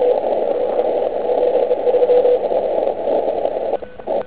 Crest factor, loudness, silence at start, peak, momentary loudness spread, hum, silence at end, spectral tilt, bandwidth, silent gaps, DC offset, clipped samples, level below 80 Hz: 14 dB; -18 LUFS; 0 s; -4 dBFS; 7 LU; none; 0 s; -9 dB/octave; 4 kHz; none; 1%; under 0.1%; -52 dBFS